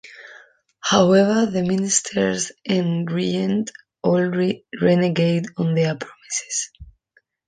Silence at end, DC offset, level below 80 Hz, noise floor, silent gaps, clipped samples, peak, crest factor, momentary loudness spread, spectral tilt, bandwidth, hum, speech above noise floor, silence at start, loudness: 0.65 s; under 0.1%; -56 dBFS; -63 dBFS; none; under 0.1%; -2 dBFS; 18 dB; 11 LU; -5 dB/octave; 10 kHz; none; 43 dB; 0.05 s; -20 LUFS